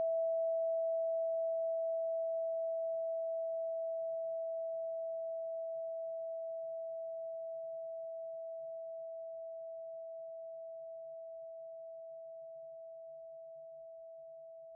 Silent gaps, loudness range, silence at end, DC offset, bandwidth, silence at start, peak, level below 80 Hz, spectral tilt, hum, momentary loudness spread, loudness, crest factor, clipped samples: none; 13 LU; 0 s; under 0.1%; 0.9 kHz; 0 s; -30 dBFS; under -90 dBFS; 12.5 dB/octave; none; 16 LU; -40 LUFS; 10 dB; under 0.1%